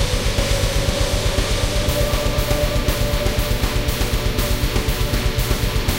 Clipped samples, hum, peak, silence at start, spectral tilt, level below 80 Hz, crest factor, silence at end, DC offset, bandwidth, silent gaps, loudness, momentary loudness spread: under 0.1%; none; -4 dBFS; 0 s; -4 dB/octave; -22 dBFS; 14 dB; 0 s; under 0.1%; 17 kHz; none; -20 LUFS; 1 LU